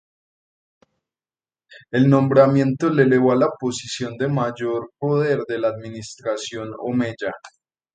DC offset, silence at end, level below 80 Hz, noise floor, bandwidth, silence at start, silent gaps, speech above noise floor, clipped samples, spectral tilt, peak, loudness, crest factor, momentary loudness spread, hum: under 0.1%; 0.45 s; -62 dBFS; under -90 dBFS; 9.4 kHz; 1.7 s; none; over 70 dB; under 0.1%; -6.5 dB/octave; 0 dBFS; -20 LUFS; 20 dB; 15 LU; none